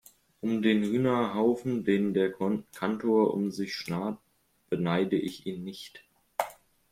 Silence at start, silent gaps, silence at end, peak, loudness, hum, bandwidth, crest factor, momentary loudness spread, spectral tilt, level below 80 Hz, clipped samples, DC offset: 0.45 s; none; 0.4 s; -10 dBFS; -29 LUFS; none; 16 kHz; 18 dB; 12 LU; -6.5 dB/octave; -66 dBFS; under 0.1%; under 0.1%